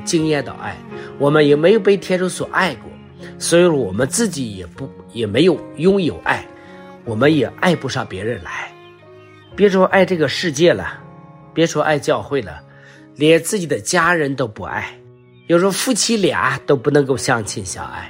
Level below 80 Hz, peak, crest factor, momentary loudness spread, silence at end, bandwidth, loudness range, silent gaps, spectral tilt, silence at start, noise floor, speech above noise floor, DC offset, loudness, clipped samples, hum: -52 dBFS; 0 dBFS; 16 dB; 17 LU; 0 s; 16 kHz; 3 LU; none; -4.5 dB/octave; 0 s; -45 dBFS; 28 dB; under 0.1%; -17 LUFS; under 0.1%; none